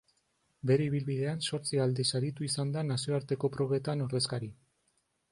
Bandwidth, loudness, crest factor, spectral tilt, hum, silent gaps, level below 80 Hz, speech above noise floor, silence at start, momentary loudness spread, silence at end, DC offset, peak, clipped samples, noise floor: 11.5 kHz; -32 LUFS; 16 dB; -5.5 dB/octave; none; none; -68 dBFS; 45 dB; 0.65 s; 5 LU; 0.8 s; under 0.1%; -16 dBFS; under 0.1%; -76 dBFS